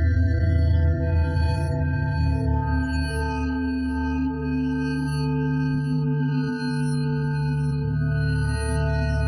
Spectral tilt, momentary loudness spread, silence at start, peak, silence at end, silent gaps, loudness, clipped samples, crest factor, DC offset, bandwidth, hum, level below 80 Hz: -8 dB/octave; 4 LU; 0 s; -10 dBFS; 0 s; none; -24 LUFS; under 0.1%; 12 dB; under 0.1%; 11.5 kHz; none; -32 dBFS